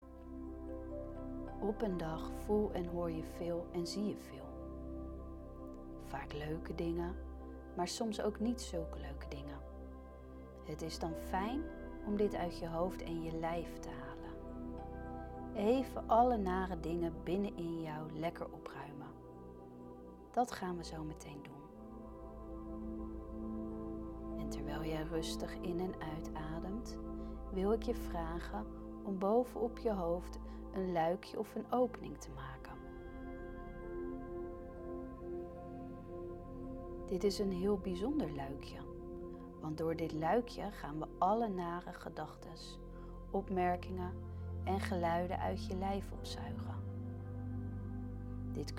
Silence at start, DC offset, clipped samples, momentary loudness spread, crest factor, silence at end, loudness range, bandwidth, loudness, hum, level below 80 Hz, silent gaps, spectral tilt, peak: 0 s; under 0.1%; under 0.1%; 14 LU; 20 dB; 0 s; 7 LU; 17 kHz; -41 LUFS; none; -52 dBFS; none; -6.5 dB/octave; -20 dBFS